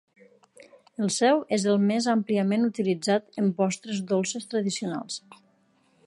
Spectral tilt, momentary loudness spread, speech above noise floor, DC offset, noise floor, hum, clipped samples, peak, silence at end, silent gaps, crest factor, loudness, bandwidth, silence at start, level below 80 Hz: -5 dB/octave; 9 LU; 40 dB; under 0.1%; -65 dBFS; none; under 0.1%; -10 dBFS; 0.75 s; none; 18 dB; -26 LUFS; 11.5 kHz; 1 s; -76 dBFS